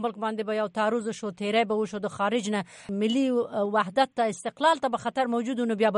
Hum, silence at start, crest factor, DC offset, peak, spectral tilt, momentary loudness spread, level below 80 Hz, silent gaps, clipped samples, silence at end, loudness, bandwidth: none; 0 s; 16 dB; under 0.1%; -10 dBFS; -5 dB/octave; 7 LU; -72 dBFS; none; under 0.1%; 0 s; -27 LUFS; 11 kHz